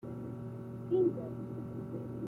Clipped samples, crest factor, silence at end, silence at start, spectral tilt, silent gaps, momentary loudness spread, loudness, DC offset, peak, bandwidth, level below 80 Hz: under 0.1%; 18 dB; 0 s; 0 s; -10.5 dB/octave; none; 12 LU; -37 LUFS; under 0.1%; -20 dBFS; 3.9 kHz; -66 dBFS